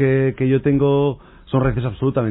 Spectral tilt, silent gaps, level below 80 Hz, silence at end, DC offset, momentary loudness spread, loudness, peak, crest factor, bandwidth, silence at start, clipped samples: -12.5 dB/octave; none; -38 dBFS; 0 s; under 0.1%; 6 LU; -19 LUFS; -6 dBFS; 12 dB; 4 kHz; 0 s; under 0.1%